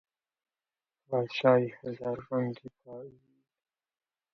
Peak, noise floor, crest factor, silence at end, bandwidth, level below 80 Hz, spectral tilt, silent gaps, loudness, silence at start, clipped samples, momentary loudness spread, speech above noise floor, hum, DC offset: -10 dBFS; under -90 dBFS; 24 dB; 1.25 s; 6.4 kHz; -74 dBFS; -8 dB/octave; none; -30 LUFS; 1.1 s; under 0.1%; 22 LU; over 59 dB; none; under 0.1%